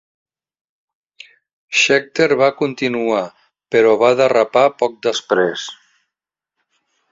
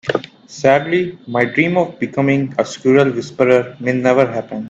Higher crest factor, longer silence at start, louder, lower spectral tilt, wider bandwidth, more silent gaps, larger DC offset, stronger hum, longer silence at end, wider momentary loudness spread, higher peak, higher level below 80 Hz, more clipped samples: about the same, 18 dB vs 16 dB; first, 1.7 s vs 0.05 s; about the same, -16 LUFS vs -16 LUFS; second, -3.5 dB/octave vs -6.5 dB/octave; about the same, 7.8 kHz vs 8 kHz; neither; neither; neither; first, 1.4 s vs 0 s; about the same, 8 LU vs 7 LU; about the same, 0 dBFS vs 0 dBFS; about the same, -62 dBFS vs -58 dBFS; neither